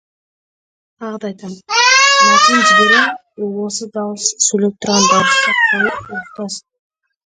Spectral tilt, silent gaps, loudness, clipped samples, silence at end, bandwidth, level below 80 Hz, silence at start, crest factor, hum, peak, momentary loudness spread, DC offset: -1.5 dB/octave; none; -11 LUFS; under 0.1%; 0.8 s; 10 kHz; -58 dBFS; 1 s; 16 dB; none; 0 dBFS; 18 LU; under 0.1%